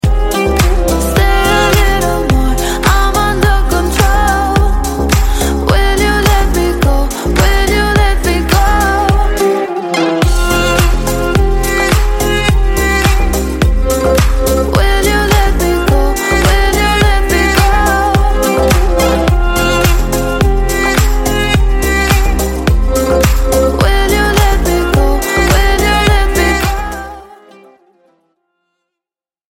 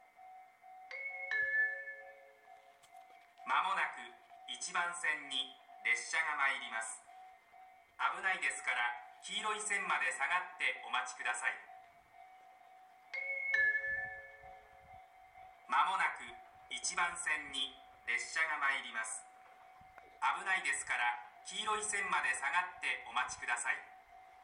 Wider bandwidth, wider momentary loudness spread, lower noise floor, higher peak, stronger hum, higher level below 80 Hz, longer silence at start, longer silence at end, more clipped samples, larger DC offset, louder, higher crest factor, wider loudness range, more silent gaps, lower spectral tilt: first, 17 kHz vs 12 kHz; second, 3 LU vs 16 LU; first, -89 dBFS vs -61 dBFS; first, 0 dBFS vs -20 dBFS; neither; first, -14 dBFS vs -78 dBFS; second, 0.05 s vs 0.2 s; first, 2.15 s vs 0 s; neither; neither; first, -12 LUFS vs -36 LUFS; second, 10 dB vs 20 dB; about the same, 2 LU vs 3 LU; neither; first, -4.5 dB/octave vs 1 dB/octave